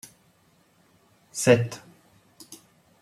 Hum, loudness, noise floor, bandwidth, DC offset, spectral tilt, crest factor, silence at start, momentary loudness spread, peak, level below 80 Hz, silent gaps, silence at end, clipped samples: none; -23 LUFS; -63 dBFS; 15.5 kHz; under 0.1%; -5 dB/octave; 24 dB; 1.35 s; 27 LU; -4 dBFS; -68 dBFS; none; 0.45 s; under 0.1%